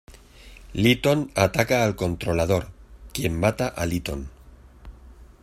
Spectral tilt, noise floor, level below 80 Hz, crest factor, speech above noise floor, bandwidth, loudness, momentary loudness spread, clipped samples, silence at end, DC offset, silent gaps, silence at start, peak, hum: -5.5 dB/octave; -48 dBFS; -42 dBFS; 22 dB; 25 dB; 16 kHz; -23 LUFS; 15 LU; under 0.1%; 0.2 s; under 0.1%; none; 0.1 s; -4 dBFS; none